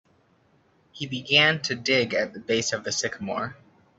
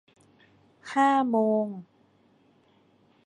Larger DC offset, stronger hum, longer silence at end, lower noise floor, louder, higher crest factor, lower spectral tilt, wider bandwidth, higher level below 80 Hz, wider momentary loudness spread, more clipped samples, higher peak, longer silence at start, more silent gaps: neither; neither; second, 0.45 s vs 1.4 s; about the same, -63 dBFS vs -63 dBFS; about the same, -24 LUFS vs -25 LUFS; about the same, 22 dB vs 18 dB; second, -2.5 dB/octave vs -6 dB/octave; second, 8.4 kHz vs 9.6 kHz; first, -66 dBFS vs -80 dBFS; second, 14 LU vs 20 LU; neither; first, -6 dBFS vs -10 dBFS; about the same, 0.95 s vs 0.85 s; neither